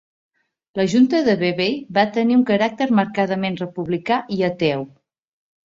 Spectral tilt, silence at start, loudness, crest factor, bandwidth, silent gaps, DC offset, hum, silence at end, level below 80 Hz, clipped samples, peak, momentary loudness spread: -6.5 dB/octave; 0.75 s; -19 LUFS; 18 dB; 7.6 kHz; none; under 0.1%; none; 0.8 s; -60 dBFS; under 0.1%; -2 dBFS; 9 LU